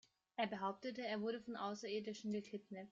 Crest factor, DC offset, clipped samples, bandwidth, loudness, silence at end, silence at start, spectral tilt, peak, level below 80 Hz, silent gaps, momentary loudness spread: 18 dB; under 0.1%; under 0.1%; 7.6 kHz; -45 LUFS; 0 s; 0.4 s; -5 dB/octave; -26 dBFS; -86 dBFS; none; 7 LU